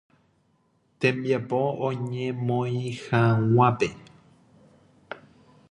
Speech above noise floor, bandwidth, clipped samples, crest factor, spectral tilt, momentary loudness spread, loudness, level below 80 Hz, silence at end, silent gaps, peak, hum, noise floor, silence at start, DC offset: 43 dB; 10 kHz; under 0.1%; 20 dB; -7.5 dB/octave; 16 LU; -25 LUFS; -62 dBFS; 0.55 s; none; -6 dBFS; none; -67 dBFS; 1 s; under 0.1%